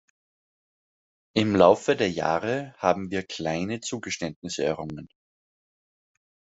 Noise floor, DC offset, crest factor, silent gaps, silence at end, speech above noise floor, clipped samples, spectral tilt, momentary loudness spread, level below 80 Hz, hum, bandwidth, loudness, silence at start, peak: under -90 dBFS; under 0.1%; 24 dB; 4.36-4.42 s; 1.45 s; over 65 dB; under 0.1%; -5 dB/octave; 13 LU; -64 dBFS; none; 8.2 kHz; -25 LUFS; 1.35 s; -4 dBFS